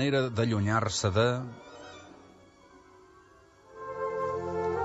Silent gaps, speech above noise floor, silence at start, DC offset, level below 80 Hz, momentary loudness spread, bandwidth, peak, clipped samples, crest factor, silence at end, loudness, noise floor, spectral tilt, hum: none; 30 dB; 0 s; under 0.1%; -60 dBFS; 20 LU; 8.4 kHz; -12 dBFS; under 0.1%; 20 dB; 0 s; -29 LUFS; -58 dBFS; -5.5 dB/octave; 50 Hz at -65 dBFS